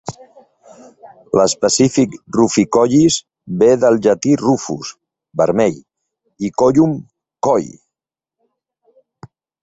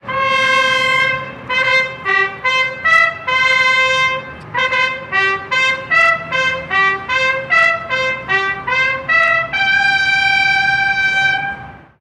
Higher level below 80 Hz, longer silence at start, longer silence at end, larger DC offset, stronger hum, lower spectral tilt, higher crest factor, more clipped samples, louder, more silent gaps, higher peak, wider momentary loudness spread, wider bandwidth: about the same, -52 dBFS vs -48 dBFS; about the same, 0.05 s vs 0.05 s; first, 1.95 s vs 0.2 s; neither; neither; first, -5 dB/octave vs -2 dB/octave; about the same, 16 dB vs 14 dB; neither; about the same, -15 LUFS vs -13 LUFS; neither; about the same, -2 dBFS vs -2 dBFS; first, 15 LU vs 5 LU; second, 8.4 kHz vs 12.5 kHz